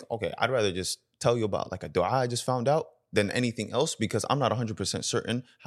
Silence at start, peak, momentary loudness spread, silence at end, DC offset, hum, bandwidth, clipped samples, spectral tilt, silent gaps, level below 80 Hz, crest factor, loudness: 0 s; -8 dBFS; 5 LU; 0.25 s; under 0.1%; none; 13 kHz; under 0.1%; -4.5 dB/octave; none; -62 dBFS; 20 dB; -28 LUFS